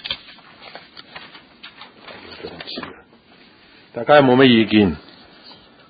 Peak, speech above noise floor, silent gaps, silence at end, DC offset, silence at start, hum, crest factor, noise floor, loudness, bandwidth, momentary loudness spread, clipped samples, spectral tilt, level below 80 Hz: 0 dBFS; 36 dB; none; 0.9 s; under 0.1%; 0.05 s; none; 20 dB; -49 dBFS; -15 LUFS; 5 kHz; 27 LU; under 0.1%; -11 dB/octave; -50 dBFS